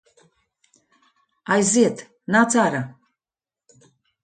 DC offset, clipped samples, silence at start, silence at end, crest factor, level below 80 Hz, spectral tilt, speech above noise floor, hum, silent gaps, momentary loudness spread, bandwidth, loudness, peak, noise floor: under 0.1%; under 0.1%; 1.5 s; 1.35 s; 20 dB; -66 dBFS; -4 dB/octave; over 71 dB; none; none; 19 LU; 9.4 kHz; -19 LUFS; -4 dBFS; under -90 dBFS